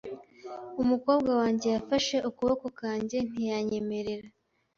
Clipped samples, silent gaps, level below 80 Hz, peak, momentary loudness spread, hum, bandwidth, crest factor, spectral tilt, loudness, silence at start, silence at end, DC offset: under 0.1%; none; -60 dBFS; -12 dBFS; 15 LU; none; 7.6 kHz; 18 dB; -5 dB/octave; -29 LUFS; 0.05 s; 0.5 s; under 0.1%